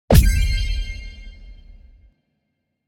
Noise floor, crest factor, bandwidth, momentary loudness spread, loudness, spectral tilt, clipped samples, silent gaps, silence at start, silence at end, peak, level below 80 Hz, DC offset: -74 dBFS; 20 dB; 16.5 kHz; 26 LU; -20 LUFS; -5.5 dB/octave; under 0.1%; none; 0.1 s; 1.35 s; 0 dBFS; -22 dBFS; under 0.1%